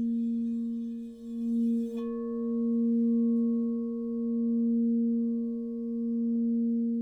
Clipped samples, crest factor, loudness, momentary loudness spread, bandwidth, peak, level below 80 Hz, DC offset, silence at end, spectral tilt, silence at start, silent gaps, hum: under 0.1%; 8 dB; -30 LUFS; 8 LU; 1.8 kHz; -20 dBFS; -68 dBFS; under 0.1%; 0 s; -10.5 dB/octave; 0 s; none; none